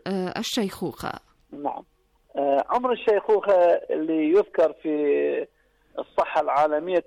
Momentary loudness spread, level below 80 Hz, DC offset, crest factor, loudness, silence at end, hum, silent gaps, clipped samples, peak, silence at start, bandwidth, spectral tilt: 14 LU; -62 dBFS; under 0.1%; 12 dB; -23 LUFS; 0.05 s; none; none; under 0.1%; -12 dBFS; 0.05 s; 15 kHz; -5 dB/octave